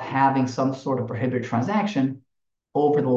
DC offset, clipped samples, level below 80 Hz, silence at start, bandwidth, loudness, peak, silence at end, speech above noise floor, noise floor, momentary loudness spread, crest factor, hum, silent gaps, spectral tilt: under 0.1%; under 0.1%; -66 dBFS; 0 s; 7.6 kHz; -24 LUFS; -6 dBFS; 0 s; 57 dB; -79 dBFS; 7 LU; 16 dB; none; none; -7.5 dB/octave